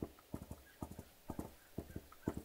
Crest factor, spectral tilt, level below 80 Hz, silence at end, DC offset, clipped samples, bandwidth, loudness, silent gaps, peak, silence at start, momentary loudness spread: 26 dB; -6.5 dB/octave; -60 dBFS; 0 s; under 0.1%; under 0.1%; 16 kHz; -51 LUFS; none; -22 dBFS; 0 s; 7 LU